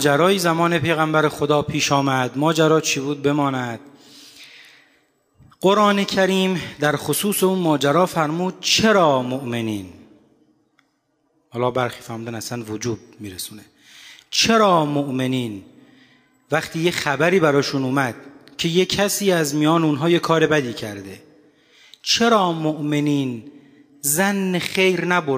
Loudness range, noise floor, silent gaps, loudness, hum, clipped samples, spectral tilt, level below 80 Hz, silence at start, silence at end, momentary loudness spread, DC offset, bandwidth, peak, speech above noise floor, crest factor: 8 LU; -67 dBFS; none; -19 LUFS; none; under 0.1%; -4.5 dB/octave; -58 dBFS; 0 s; 0 s; 14 LU; under 0.1%; 16 kHz; -4 dBFS; 48 dB; 18 dB